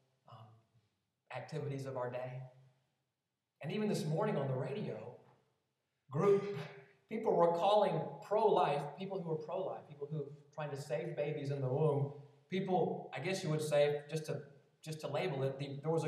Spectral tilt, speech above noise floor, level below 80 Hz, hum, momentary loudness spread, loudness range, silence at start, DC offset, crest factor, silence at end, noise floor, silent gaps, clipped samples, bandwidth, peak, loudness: -6.5 dB/octave; 53 dB; under -90 dBFS; none; 15 LU; 7 LU; 0.3 s; under 0.1%; 20 dB; 0 s; -89 dBFS; none; under 0.1%; 14 kHz; -18 dBFS; -37 LUFS